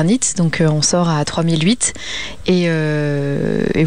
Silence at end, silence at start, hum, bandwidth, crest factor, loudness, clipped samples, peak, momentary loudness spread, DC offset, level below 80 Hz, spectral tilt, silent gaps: 0 s; 0 s; none; 10 kHz; 12 dB; -16 LUFS; under 0.1%; -4 dBFS; 4 LU; 2%; -42 dBFS; -4.5 dB/octave; none